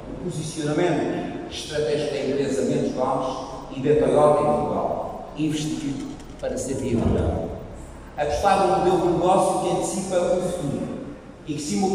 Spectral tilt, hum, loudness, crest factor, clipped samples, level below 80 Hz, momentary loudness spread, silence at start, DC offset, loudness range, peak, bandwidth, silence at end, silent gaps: -5.5 dB/octave; none; -23 LUFS; 18 dB; under 0.1%; -42 dBFS; 14 LU; 0 s; under 0.1%; 4 LU; -6 dBFS; 15.5 kHz; 0 s; none